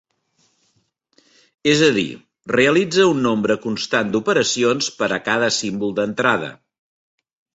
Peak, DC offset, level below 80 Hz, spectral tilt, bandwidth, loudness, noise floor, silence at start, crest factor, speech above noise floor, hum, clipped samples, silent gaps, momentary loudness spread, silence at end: -2 dBFS; under 0.1%; -58 dBFS; -4 dB/octave; 8.2 kHz; -18 LUFS; -66 dBFS; 1.65 s; 18 dB; 48 dB; none; under 0.1%; none; 8 LU; 1 s